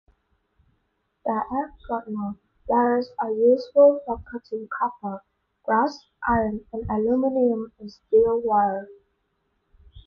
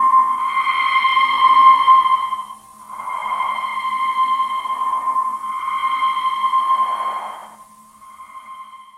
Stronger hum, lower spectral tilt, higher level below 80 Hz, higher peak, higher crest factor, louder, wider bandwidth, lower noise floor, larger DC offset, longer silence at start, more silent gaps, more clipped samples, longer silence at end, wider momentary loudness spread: neither; first, -8 dB/octave vs -0.5 dB/octave; first, -50 dBFS vs -64 dBFS; second, -6 dBFS vs 0 dBFS; about the same, 18 dB vs 18 dB; second, -23 LUFS vs -17 LUFS; second, 6.6 kHz vs 13 kHz; first, -73 dBFS vs -44 dBFS; neither; first, 1.25 s vs 0 s; neither; neither; about the same, 0.05 s vs 0.15 s; second, 15 LU vs 21 LU